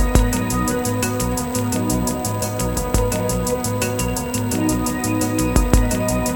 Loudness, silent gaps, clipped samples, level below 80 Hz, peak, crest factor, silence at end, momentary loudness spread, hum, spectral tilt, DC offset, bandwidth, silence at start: -20 LUFS; none; under 0.1%; -26 dBFS; 0 dBFS; 20 dB; 0 s; 4 LU; none; -5 dB/octave; under 0.1%; 17.5 kHz; 0 s